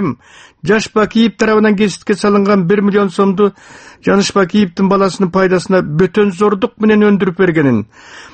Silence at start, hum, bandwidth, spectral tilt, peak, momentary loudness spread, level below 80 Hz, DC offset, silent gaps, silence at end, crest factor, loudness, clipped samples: 0 s; none; 8.8 kHz; -6 dB/octave; 0 dBFS; 4 LU; -46 dBFS; under 0.1%; none; 0.05 s; 12 dB; -12 LUFS; under 0.1%